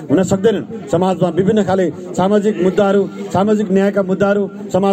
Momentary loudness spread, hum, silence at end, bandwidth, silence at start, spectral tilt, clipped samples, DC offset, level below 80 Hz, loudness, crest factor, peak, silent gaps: 5 LU; none; 0 s; 9 kHz; 0 s; -7 dB/octave; under 0.1%; under 0.1%; -52 dBFS; -15 LUFS; 12 dB; -2 dBFS; none